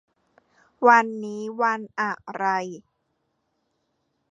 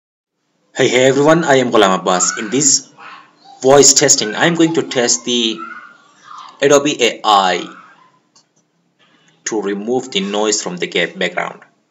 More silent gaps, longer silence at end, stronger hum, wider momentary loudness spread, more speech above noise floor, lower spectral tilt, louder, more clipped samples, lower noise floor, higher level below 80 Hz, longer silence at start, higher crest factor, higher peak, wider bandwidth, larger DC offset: neither; first, 1.5 s vs 0.35 s; neither; first, 15 LU vs 11 LU; first, 51 dB vs 47 dB; first, -5 dB/octave vs -2.5 dB/octave; second, -23 LUFS vs -13 LUFS; second, under 0.1% vs 0.1%; first, -74 dBFS vs -61 dBFS; second, -78 dBFS vs -58 dBFS; about the same, 0.8 s vs 0.75 s; first, 24 dB vs 16 dB; about the same, -2 dBFS vs 0 dBFS; second, 7.8 kHz vs over 20 kHz; neither